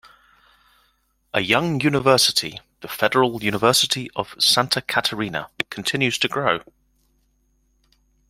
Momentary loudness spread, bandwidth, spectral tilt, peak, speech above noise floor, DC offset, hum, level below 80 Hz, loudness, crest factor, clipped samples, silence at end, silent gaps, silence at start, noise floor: 11 LU; 16.5 kHz; -3 dB/octave; -2 dBFS; 45 dB; under 0.1%; none; -58 dBFS; -20 LUFS; 22 dB; under 0.1%; 1.7 s; none; 1.35 s; -66 dBFS